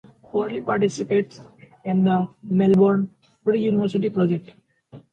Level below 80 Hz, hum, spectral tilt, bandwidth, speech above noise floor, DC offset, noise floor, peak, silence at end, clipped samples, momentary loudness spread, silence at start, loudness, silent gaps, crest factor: -62 dBFS; none; -8 dB/octave; 8.8 kHz; 27 dB; under 0.1%; -47 dBFS; -6 dBFS; 0.15 s; under 0.1%; 11 LU; 0.35 s; -22 LUFS; none; 16 dB